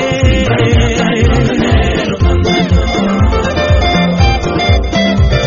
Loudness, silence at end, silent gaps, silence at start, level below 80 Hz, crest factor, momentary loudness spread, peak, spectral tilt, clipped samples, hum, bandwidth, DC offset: -11 LUFS; 0 s; none; 0 s; -16 dBFS; 10 dB; 2 LU; 0 dBFS; -5 dB/octave; under 0.1%; none; 7.4 kHz; 0.3%